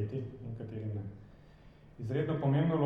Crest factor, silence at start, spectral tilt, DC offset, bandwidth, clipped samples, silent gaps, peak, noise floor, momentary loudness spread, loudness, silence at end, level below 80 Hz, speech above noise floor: 16 dB; 0 s; -10 dB/octave; under 0.1%; 4.9 kHz; under 0.1%; none; -18 dBFS; -56 dBFS; 16 LU; -35 LUFS; 0 s; -60 dBFS; 25 dB